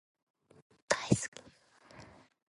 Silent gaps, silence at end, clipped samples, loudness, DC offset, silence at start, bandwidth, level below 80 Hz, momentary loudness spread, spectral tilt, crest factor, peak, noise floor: 1.28-1.32 s; 0.45 s; under 0.1%; -34 LUFS; under 0.1%; 0.9 s; 11.5 kHz; -64 dBFS; 26 LU; -4.5 dB/octave; 28 dB; -12 dBFS; -62 dBFS